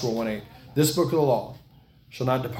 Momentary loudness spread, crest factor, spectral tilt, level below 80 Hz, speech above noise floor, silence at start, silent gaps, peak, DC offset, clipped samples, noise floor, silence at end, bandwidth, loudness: 15 LU; 16 dB; -5.5 dB/octave; -56 dBFS; 30 dB; 0 s; none; -10 dBFS; under 0.1%; under 0.1%; -54 dBFS; 0 s; 17 kHz; -25 LUFS